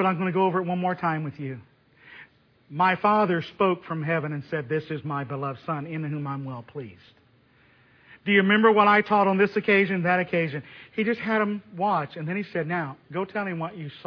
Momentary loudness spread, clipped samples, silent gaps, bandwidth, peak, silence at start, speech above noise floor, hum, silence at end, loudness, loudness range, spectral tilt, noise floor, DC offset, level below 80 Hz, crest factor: 15 LU; under 0.1%; none; 5.4 kHz; -6 dBFS; 0 s; 35 dB; none; 0.05 s; -24 LUFS; 10 LU; -8.5 dB/octave; -60 dBFS; under 0.1%; -70 dBFS; 20 dB